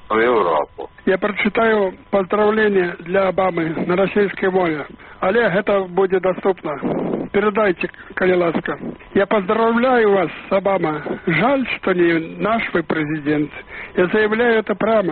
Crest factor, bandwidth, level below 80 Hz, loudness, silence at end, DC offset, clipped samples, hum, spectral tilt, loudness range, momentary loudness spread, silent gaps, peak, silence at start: 14 dB; 4.5 kHz; -50 dBFS; -18 LUFS; 0 s; under 0.1%; under 0.1%; none; -4.5 dB/octave; 2 LU; 7 LU; none; -4 dBFS; 0.05 s